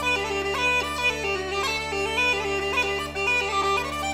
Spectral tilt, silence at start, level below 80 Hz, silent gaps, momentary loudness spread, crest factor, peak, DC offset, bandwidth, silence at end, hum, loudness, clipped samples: -2.5 dB/octave; 0 s; -44 dBFS; none; 4 LU; 14 dB; -12 dBFS; under 0.1%; 16 kHz; 0 s; none; -24 LUFS; under 0.1%